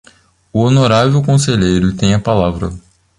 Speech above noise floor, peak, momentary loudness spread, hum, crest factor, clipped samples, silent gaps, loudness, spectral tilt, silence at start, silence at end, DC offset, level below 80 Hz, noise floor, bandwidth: 36 dB; 0 dBFS; 9 LU; none; 12 dB; under 0.1%; none; -13 LUFS; -6 dB/octave; 0.55 s; 0.4 s; under 0.1%; -34 dBFS; -48 dBFS; 11.5 kHz